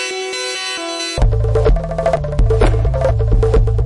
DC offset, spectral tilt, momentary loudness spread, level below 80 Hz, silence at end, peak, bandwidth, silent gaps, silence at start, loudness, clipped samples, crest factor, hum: under 0.1%; -5.5 dB/octave; 6 LU; -18 dBFS; 0 s; -4 dBFS; 11 kHz; none; 0 s; -17 LUFS; under 0.1%; 10 dB; none